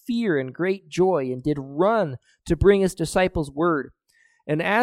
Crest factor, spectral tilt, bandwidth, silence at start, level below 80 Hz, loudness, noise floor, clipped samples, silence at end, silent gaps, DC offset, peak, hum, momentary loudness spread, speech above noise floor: 18 dB; -6.5 dB/octave; 14 kHz; 0.1 s; -42 dBFS; -23 LUFS; -63 dBFS; under 0.1%; 0 s; none; under 0.1%; -4 dBFS; none; 10 LU; 41 dB